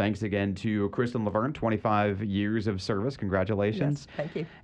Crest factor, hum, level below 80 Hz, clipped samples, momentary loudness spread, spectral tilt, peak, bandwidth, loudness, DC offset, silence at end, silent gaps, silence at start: 16 dB; none; -56 dBFS; under 0.1%; 4 LU; -7.5 dB/octave; -12 dBFS; 9.4 kHz; -29 LUFS; under 0.1%; 0.05 s; none; 0 s